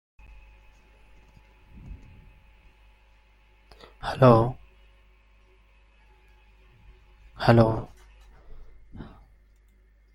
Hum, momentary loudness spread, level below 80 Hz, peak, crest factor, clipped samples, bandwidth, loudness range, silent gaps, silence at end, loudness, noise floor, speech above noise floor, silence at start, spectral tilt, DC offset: 50 Hz at -55 dBFS; 29 LU; -48 dBFS; -4 dBFS; 26 dB; under 0.1%; 11.5 kHz; 2 LU; none; 1.1 s; -22 LUFS; -58 dBFS; 38 dB; 1.85 s; -8.5 dB/octave; under 0.1%